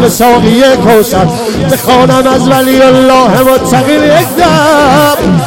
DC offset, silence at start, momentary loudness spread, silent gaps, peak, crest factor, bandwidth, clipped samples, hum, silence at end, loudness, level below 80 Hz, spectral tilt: under 0.1%; 0 s; 4 LU; none; 0 dBFS; 6 dB; 17.5 kHz; 1%; none; 0 s; -6 LUFS; -30 dBFS; -5 dB/octave